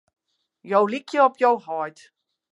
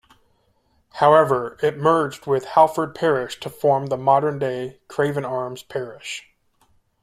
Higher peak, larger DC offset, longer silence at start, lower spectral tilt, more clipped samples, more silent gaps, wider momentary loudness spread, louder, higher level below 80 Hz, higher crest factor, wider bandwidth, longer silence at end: second, -6 dBFS vs -2 dBFS; neither; second, 0.65 s vs 0.95 s; about the same, -5.5 dB/octave vs -6 dB/octave; neither; neither; second, 12 LU vs 15 LU; about the same, -22 LUFS vs -20 LUFS; second, -82 dBFS vs -62 dBFS; about the same, 18 dB vs 20 dB; second, 11 kHz vs 15 kHz; second, 0.6 s vs 0.8 s